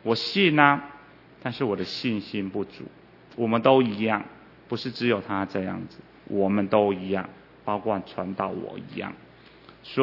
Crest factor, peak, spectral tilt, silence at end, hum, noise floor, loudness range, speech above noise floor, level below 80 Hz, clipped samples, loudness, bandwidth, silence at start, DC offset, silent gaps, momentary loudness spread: 26 dB; 0 dBFS; -7 dB/octave; 0 s; none; -51 dBFS; 2 LU; 26 dB; -66 dBFS; under 0.1%; -25 LUFS; 6 kHz; 0.05 s; under 0.1%; none; 19 LU